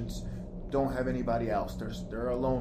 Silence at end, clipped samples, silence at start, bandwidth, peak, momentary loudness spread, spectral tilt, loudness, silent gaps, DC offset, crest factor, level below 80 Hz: 0 s; under 0.1%; 0 s; 15.5 kHz; -18 dBFS; 9 LU; -7.5 dB/octave; -33 LUFS; none; under 0.1%; 14 dB; -42 dBFS